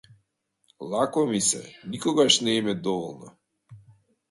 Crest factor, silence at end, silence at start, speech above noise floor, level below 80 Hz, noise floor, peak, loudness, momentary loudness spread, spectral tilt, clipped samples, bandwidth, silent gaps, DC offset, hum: 22 dB; 0.5 s; 0.8 s; 48 dB; -68 dBFS; -73 dBFS; -6 dBFS; -24 LUFS; 18 LU; -3 dB/octave; under 0.1%; 11.5 kHz; none; under 0.1%; none